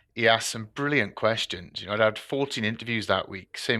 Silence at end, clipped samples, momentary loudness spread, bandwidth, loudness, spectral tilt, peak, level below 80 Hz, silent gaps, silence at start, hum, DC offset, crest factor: 0 s; under 0.1%; 9 LU; 13.5 kHz; -26 LUFS; -4 dB/octave; -6 dBFS; -64 dBFS; none; 0.15 s; none; under 0.1%; 20 dB